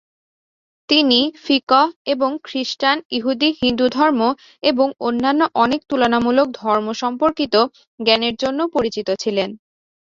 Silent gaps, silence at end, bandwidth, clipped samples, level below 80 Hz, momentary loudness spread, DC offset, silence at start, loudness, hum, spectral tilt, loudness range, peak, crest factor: 1.63-1.67 s, 1.96-2.05 s, 3.05-3.10 s, 7.87-7.98 s; 0.55 s; 7.6 kHz; under 0.1%; -56 dBFS; 6 LU; under 0.1%; 0.9 s; -18 LUFS; none; -4 dB/octave; 2 LU; -2 dBFS; 18 dB